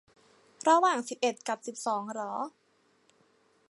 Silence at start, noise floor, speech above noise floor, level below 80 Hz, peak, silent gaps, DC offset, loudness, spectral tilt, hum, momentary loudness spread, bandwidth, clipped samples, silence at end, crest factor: 0.65 s; -68 dBFS; 39 dB; -86 dBFS; -12 dBFS; none; under 0.1%; -30 LUFS; -2.5 dB/octave; none; 12 LU; 11.5 kHz; under 0.1%; 1.2 s; 20 dB